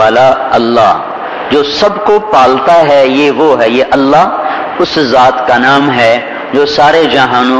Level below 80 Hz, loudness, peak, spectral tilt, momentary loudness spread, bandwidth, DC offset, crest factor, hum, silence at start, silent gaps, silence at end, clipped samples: -42 dBFS; -8 LUFS; 0 dBFS; -5 dB/octave; 6 LU; 11 kHz; 0.3%; 8 dB; none; 0 s; none; 0 s; 3%